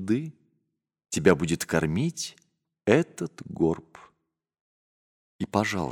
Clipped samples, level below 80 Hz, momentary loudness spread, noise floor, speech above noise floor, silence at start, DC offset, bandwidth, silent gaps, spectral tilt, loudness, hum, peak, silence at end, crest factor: under 0.1%; -56 dBFS; 13 LU; -78 dBFS; 53 dB; 0 s; under 0.1%; 16.5 kHz; 4.60-5.39 s; -5.5 dB/octave; -27 LUFS; none; -4 dBFS; 0 s; 24 dB